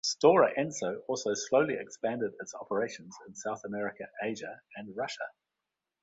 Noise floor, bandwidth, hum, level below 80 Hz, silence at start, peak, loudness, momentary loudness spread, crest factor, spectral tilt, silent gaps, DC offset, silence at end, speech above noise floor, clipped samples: -88 dBFS; 8 kHz; none; -74 dBFS; 0.05 s; -10 dBFS; -31 LUFS; 18 LU; 22 dB; -3.5 dB/octave; none; under 0.1%; 0.75 s; 57 dB; under 0.1%